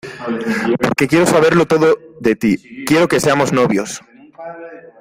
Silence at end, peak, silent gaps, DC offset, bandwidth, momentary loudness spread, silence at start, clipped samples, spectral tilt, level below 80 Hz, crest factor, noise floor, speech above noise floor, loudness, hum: 0.15 s; 0 dBFS; none; under 0.1%; 16 kHz; 19 LU; 0.05 s; under 0.1%; -5 dB/octave; -50 dBFS; 16 dB; -34 dBFS; 20 dB; -15 LUFS; none